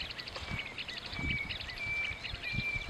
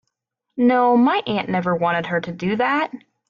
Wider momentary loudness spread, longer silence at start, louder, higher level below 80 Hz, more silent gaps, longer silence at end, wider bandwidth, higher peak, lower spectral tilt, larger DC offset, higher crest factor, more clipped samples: second, 5 LU vs 9 LU; second, 0 s vs 0.55 s; second, -36 LUFS vs -19 LUFS; first, -50 dBFS vs -62 dBFS; neither; second, 0 s vs 0.3 s; first, 14 kHz vs 6.8 kHz; second, -22 dBFS vs -6 dBFS; second, -4 dB/octave vs -7.5 dB/octave; neither; about the same, 18 dB vs 14 dB; neither